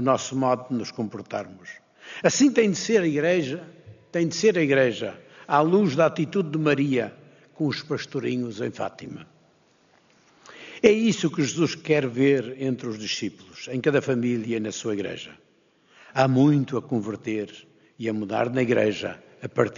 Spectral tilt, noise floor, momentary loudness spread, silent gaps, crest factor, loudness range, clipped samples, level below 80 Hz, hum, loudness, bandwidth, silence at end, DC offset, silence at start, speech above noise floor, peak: -5 dB/octave; -62 dBFS; 15 LU; none; 22 dB; 5 LU; under 0.1%; -68 dBFS; none; -24 LUFS; 7.4 kHz; 0 s; under 0.1%; 0 s; 38 dB; -2 dBFS